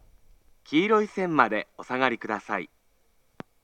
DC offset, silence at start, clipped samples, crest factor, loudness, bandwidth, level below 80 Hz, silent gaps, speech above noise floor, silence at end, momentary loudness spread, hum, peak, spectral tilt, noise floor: under 0.1%; 0.7 s; under 0.1%; 24 dB; -26 LUFS; 9.2 kHz; -64 dBFS; none; 42 dB; 0.95 s; 10 LU; none; -4 dBFS; -6 dB/octave; -67 dBFS